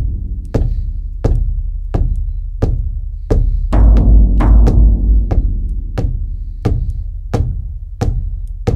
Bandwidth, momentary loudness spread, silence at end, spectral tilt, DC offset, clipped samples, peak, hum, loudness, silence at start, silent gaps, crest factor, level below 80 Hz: 6 kHz; 13 LU; 0 s; -9 dB/octave; under 0.1%; under 0.1%; 0 dBFS; none; -17 LUFS; 0 s; none; 12 dB; -14 dBFS